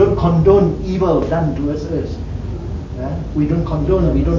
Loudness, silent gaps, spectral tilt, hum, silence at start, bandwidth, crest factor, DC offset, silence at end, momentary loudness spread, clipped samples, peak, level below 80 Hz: -17 LUFS; none; -9.5 dB/octave; none; 0 s; 7.2 kHz; 16 dB; under 0.1%; 0 s; 13 LU; under 0.1%; 0 dBFS; -24 dBFS